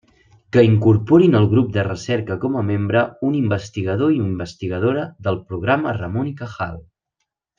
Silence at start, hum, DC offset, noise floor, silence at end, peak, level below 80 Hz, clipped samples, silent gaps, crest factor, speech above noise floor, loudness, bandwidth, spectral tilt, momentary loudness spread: 0.55 s; none; under 0.1%; -77 dBFS; 0.75 s; -2 dBFS; -52 dBFS; under 0.1%; none; 16 dB; 59 dB; -19 LUFS; 7.4 kHz; -8 dB/octave; 13 LU